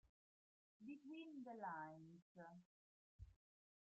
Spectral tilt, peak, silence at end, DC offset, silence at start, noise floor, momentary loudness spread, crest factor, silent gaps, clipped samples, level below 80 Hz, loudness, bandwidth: -5 dB/octave; -40 dBFS; 0.5 s; under 0.1%; 0.05 s; under -90 dBFS; 16 LU; 18 dB; 0.09-0.80 s, 2.22-2.35 s, 2.65-3.19 s; under 0.1%; -78 dBFS; -57 LUFS; 7.6 kHz